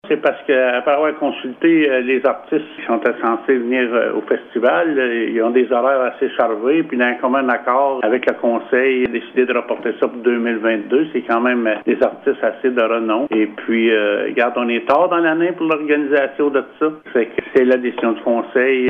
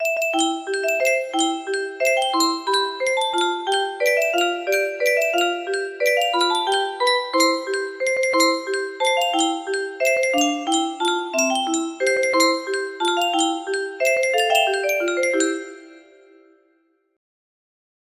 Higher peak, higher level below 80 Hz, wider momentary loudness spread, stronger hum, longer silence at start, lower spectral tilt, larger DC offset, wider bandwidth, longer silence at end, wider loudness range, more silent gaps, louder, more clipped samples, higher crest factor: about the same, -2 dBFS vs -4 dBFS; first, -64 dBFS vs -72 dBFS; about the same, 4 LU vs 6 LU; neither; about the same, 0.05 s vs 0 s; first, -7.5 dB/octave vs 0 dB/octave; neither; second, 4.6 kHz vs 15.5 kHz; second, 0 s vs 2.15 s; about the same, 1 LU vs 2 LU; neither; first, -17 LUFS vs -20 LUFS; neither; about the same, 14 dB vs 18 dB